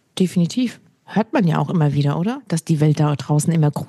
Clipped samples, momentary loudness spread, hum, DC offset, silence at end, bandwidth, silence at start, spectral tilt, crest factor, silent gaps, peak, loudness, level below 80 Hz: under 0.1%; 6 LU; none; under 0.1%; 0.05 s; 12.5 kHz; 0.15 s; -7 dB/octave; 14 dB; none; -4 dBFS; -19 LUFS; -64 dBFS